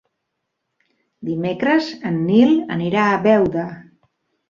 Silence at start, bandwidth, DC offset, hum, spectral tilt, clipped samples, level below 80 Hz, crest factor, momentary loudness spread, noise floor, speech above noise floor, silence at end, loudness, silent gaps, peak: 1.2 s; 7.2 kHz; under 0.1%; none; -7.5 dB/octave; under 0.1%; -56 dBFS; 16 dB; 12 LU; -76 dBFS; 59 dB; 0.65 s; -18 LUFS; none; -2 dBFS